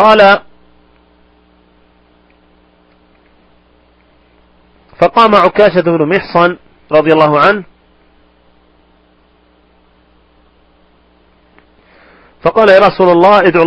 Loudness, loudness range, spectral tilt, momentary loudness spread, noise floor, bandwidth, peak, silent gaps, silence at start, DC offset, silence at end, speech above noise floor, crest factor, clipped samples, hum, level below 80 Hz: -8 LUFS; 9 LU; -7 dB/octave; 7 LU; -50 dBFS; 8.4 kHz; 0 dBFS; none; 0 s; under 0.1%; 0 s; 42 dB; 12 dB; 0.5%; none; -46 dBFS